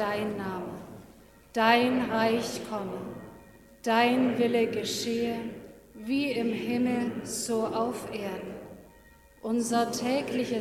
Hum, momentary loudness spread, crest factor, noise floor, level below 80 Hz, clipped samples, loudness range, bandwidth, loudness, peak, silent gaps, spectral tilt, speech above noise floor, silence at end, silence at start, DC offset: none; 18 LU; 22 dB; -56 dBFS; -62 dBFS; under 0.1%; 4 LU; 16.5 kHz; -28 LUFS; -6 dBFS; none; -4 dB/octave; 28 dB; 0 s; 0 s; under 0.1%